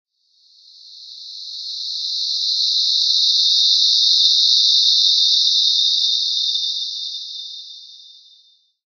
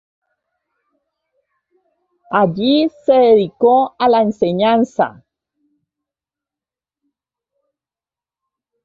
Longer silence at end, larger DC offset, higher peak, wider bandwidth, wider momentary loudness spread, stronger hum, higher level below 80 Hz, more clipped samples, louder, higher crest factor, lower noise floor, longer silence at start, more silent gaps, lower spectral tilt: second, 0.9 s vs 3.75 s; neither; about the same, 0 dBFS vs -2 dBFS; first, 9 kHz vs 7.4 kHz; first, 18 LU vs 7 LU; neither; second, under -90 dBFS vs -60 dBFS; neither; about the same, -14 LUFS vs -14 LUFS; about the same, 18 dB vs 16 dB; second, -57 dBFS vs under -90 dBFS; second, 0.85 s vs 2.3 s; neither; second, 9.5 dB/octave vs -7 dB/octave